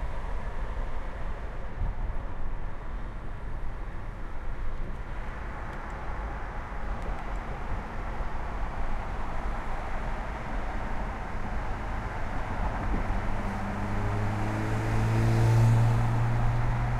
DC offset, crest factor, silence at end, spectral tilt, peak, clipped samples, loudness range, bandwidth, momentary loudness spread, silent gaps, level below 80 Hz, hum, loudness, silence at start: under 0.1%; 16 dB; 0 s; -7.5 dB/octave; -12 dBFS; under 0.1%; 12 LU; 11 kHz; 14 LU; none; -32 dBFS; none; -33 LUFS; 0 s